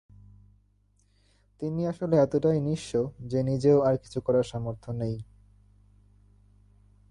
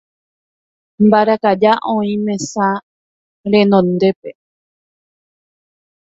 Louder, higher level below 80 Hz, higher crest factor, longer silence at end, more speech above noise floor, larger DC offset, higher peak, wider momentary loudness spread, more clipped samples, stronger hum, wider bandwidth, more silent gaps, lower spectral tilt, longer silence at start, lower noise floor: second, -27 LUFS vs -14 LUFS; about the same, -56 dBFS vs -58 dBFS; about the same, 18 dB vs 16 dB; about the same, 1.9 s vs 1.85 s; second, 40 dB vs over 77 dB; neither; second, -10 dBFS vs 0 dBFS; about the same, 12 LU vs 12 LU; neither; first, 50 Hz at -50 dBFS vs none; first, 11 kHz vs 7.8 kHz; second, none vs 2.83-3.44 s, 4.16-4.23 s; first, -8 dB/octave vs -6 dB/octave; first, 1.6 s vs 1 s; second, -66 dBFS vs under -90 dBFS